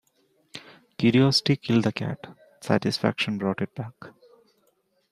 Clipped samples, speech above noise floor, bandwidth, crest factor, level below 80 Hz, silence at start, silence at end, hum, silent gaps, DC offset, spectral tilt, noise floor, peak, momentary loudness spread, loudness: under 0.1%; 45 dB; 14 kHz; 22 dB; -66 dBFS; 0.55 s; 1 s; none; none; under 0.1%; -6 dB/octave; -69 dBFS; -6 dBFS; 23 LU; -24 LUFS